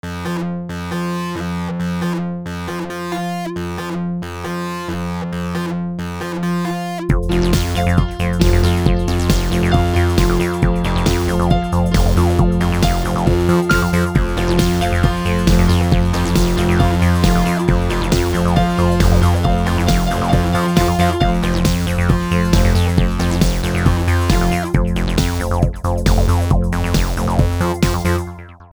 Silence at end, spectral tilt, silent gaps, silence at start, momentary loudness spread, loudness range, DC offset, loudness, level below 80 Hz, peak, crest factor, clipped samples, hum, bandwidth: 0.05 s; -6 dB/octave; none; 0.05 s; 9 LU; 7 LU; under 0.1%; -17 LUFS; -22 dBFS; 0 dBFS; 14 dB; under 0.1%; none; over 20 kHz